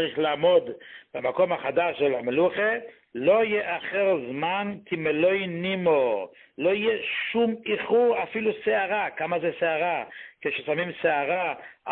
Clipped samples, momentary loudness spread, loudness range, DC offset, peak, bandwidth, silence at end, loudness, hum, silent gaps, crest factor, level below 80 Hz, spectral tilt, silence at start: under 0.1%; 9 LU; 2 LU; under 0.1%; -10 dBFS; 4.3 kHz; 0 s; -25 LUFS; none; none; 16 dB; -68 dBFS; -9.5 dB/octave; 0 s